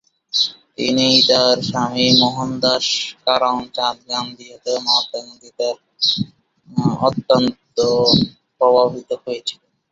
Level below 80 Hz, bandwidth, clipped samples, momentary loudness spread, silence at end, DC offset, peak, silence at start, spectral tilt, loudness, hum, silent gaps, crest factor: -54 dBFS; 7.8 kHz; under 0.1%; 13 LU; 0.4 s; under 0.1%; 0 dBFS; 0.35 s; -4 dB/octave; -17 LUFS; none; none; 18 dB